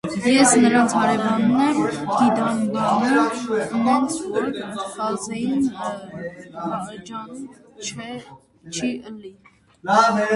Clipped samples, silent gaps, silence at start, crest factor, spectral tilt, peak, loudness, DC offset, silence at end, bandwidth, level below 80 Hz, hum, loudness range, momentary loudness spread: under 0.1%; none; 0.05 s; 18 dB; -4 dB/octave; -2 dBFS; -20 LUFS; under 0.1%; 0 s; 11.5 kHz; -60 dBFS; none; 13 LU; 18 LU